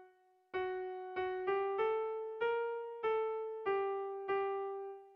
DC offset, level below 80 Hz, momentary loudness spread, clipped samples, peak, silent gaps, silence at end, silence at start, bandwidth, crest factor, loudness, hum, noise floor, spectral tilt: under 0.1%; -76 dBFS; 6 LU; under 0.1%; -24 dBFS; none; 0 s; 0 s; 5.4 kHz; 14 dB; -38 LUFS; none; -67 dBFS; -6.5 dB/octave